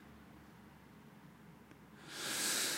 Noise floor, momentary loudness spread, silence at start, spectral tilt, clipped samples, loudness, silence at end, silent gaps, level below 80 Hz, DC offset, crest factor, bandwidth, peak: -59 dBFS; 24 LU; 0 s; -0.5 dB/octave; under 0.1%; -38 LUFS; 0 s; none; -72 dBFS; under 0.1%; 20 dB; 16 kHz; -24 dBFS